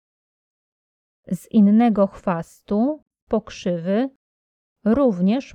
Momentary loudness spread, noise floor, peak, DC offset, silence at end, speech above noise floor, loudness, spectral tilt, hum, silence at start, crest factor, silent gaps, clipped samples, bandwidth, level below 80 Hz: 13 LU; under -90 dBFS; -6 dBFS; under 0.1%; 0.1 s; over 71 dB; -21 LUFS; -8 dB/octave; none; 1.3 s; 16 dB; 3.02-3.06 s, 3.22-3.27 s, 4.16-4.76 s; under 0.1%; 11 kHz; -54 dBFS